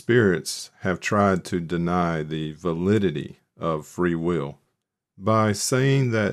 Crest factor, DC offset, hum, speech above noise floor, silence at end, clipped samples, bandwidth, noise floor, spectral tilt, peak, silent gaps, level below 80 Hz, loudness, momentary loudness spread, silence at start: 18 dB; under 0.1%; none; 55 dB; 0 s; under 0.1%; 14.5 kHz; -78 dBFS; -5.5 dB/octave; -6 dBFS; none; -54 dBFS; -24 LUFS; 10 LU; 0.1 s